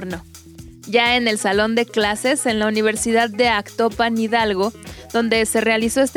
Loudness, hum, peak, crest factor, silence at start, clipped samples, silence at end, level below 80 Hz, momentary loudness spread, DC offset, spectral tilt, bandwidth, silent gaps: -18 LUFS; none; -2 dBFS; 18 dB; 0 s; under 0.1%; 0 s; -46 dBFS; 7 LU; under 0.1%; -3 dB/octave; 18 kHz; none